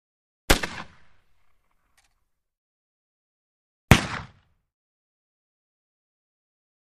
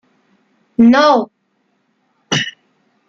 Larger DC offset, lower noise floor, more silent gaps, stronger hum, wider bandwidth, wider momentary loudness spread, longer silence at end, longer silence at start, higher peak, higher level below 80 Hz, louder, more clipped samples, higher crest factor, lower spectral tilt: neither; first, -73 dBFS vs -64 dBFS; first, 2.58-3.88 s vs none; neither; first, 15 kHz vs 7.6 kHz; first, 20 LU vs 16 LU; first, 2.75 s vs 0.6 s; second, 0.5 s vs 0.8 s; about the same, 0 dBFS vs -2 dBFS; first, -38 dBFS vs -60 dBFS; second, -22 LUFS vs -13 LUFS; neither; first, 30 dB vs 16 dB; about the same, -4.5 dB/octave vs -4.5 dB/octave